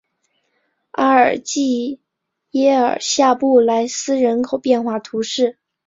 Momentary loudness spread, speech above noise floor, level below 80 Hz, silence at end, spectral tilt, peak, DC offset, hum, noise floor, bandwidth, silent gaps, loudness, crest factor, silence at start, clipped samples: 9 LU; 60 dB; -64 dBFS; 0.35 s; -3 dB/octave; -2 dBFS; under 0.1%; none; -76 dBFS; 7.8 kHz; none; -17 LUFS; 16 dB; 1 s; under 0.1%